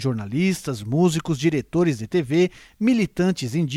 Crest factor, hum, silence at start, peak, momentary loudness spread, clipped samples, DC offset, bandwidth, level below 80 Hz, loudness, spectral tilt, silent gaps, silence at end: 14 dB; none; 0 s; -6 dBFS; 4 LU; under 0.1%; under 0.1%; 14.5 kHz; -52 dBFS; -22 LUFS; -6.5 dB/octave; none; 0 s